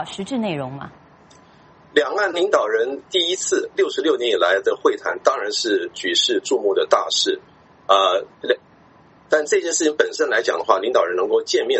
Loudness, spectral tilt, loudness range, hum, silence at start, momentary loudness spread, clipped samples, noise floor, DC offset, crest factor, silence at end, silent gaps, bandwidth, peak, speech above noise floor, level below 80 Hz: -19 LUFS; -2 dB/octave; 2 LU; none; 0 s; 7 LU; under 0.1%; -51 dBFS; under 0.1%; 20 dB; 0 s; none; 8.4 kHz; 0 dBFS; 31 dB; -66 dBFS